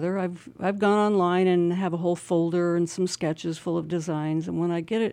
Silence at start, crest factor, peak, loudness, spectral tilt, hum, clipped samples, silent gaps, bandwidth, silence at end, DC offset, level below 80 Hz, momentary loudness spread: 0 s; 14 dB; -10 dBFS; -25 LUFS; -6.5 dB/octave; none; under 0.1%; none; 11.5 kHz; 0 s; under 0.1%; -68 dBFS; 8 LU